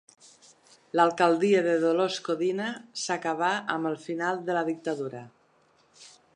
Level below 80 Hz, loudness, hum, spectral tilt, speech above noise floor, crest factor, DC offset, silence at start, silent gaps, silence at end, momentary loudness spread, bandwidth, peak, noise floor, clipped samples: -82 dBFS; -27 LUFS; none; -4.5 dB/octave; 38 dB; 20 dB; under 0.1%; 0.95 s; none; 0.3 s; 11 LU; 10.5 kHz; -8 dBFS; -64 dBFS; under 0.1%